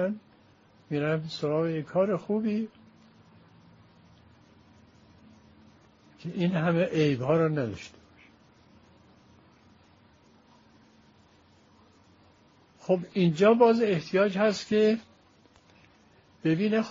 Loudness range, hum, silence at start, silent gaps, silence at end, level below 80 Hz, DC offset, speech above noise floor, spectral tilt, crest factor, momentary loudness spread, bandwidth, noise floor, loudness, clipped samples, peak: 12 LU; none; 0 s; none; 0 s; -68 dBFS; under 0.1%; 35 dB; -6 dB/octave; 22 dB; 13 LU; 7.4 kHz; -60 dBFS; -26 LUFS; under 0.1%; -8 dBFS